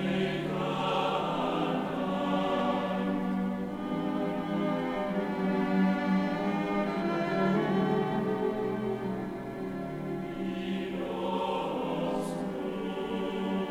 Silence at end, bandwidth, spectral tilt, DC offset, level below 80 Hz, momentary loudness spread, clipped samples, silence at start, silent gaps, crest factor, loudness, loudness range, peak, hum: 0 s; 12 kHz; -7 dB/octave; under 0.1%; -58 dBFS; 7 LU; under 0.1%; 0 s; none; 14 dB; -31 LUFS; 5 LU; -16 dBFS; none